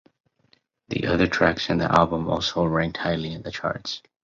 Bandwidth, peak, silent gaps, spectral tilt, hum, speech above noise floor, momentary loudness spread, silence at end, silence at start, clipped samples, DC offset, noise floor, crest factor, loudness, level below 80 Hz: 7.6 kHz; -2 dBFS; none; -5.5 dB/octave; none; 41 dB; 11 LU; 0.25 s; 0.9 s; under 0.1%; under 0.1%; -64 dBFS; 22 dB; -23 LUFS; -46 dBFS